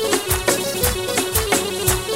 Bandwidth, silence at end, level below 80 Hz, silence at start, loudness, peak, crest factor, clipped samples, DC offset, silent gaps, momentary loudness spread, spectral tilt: 16.5 kHz; 0 s; -32 dBFS; 0 s; -19 LUFS; -2 dBFS; 18 dB; under 0.1%; 0.3%; none; 2 LU; -3 dB/octave